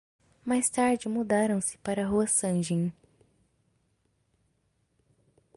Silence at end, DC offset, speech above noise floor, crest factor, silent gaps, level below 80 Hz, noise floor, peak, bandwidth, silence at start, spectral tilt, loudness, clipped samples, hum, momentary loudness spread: 2.65 s; under 0.1%; 46 dB; 16 dB; none; -62 dBFS; -73 dBFS; -14 dBFS; 11.5 kHz; 0.45 s; -5 dB/octave; -28 LUFS; under 0.1%; none; 6 LU